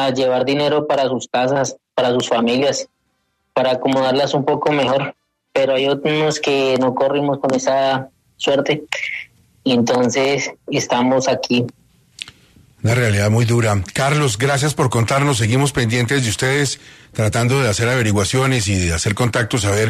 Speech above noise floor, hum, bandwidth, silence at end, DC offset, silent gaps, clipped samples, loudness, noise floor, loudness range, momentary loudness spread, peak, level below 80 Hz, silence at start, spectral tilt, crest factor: 51 dB; none; 13.5 kHz; 0 s; under 0.1%; none; under 0.1%; -17 LUFS; -67 dBFS; 2 LU; 7 LU; -4 dBFS; -44 dBFS; 0 s; -5 dB/octave; 14 dB